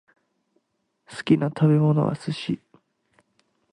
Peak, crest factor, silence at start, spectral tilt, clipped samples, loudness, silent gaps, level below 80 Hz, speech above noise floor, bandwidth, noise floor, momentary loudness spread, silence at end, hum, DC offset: -6 dBFS; 20 dB; 1.1 s; -8 dB/octave; under 0.1%; -23 LUFS; none; -64 dBFS; 52 dB; 10 kHz; -73 dBFS; 15 LU; 1.15 s; none; under 0.1%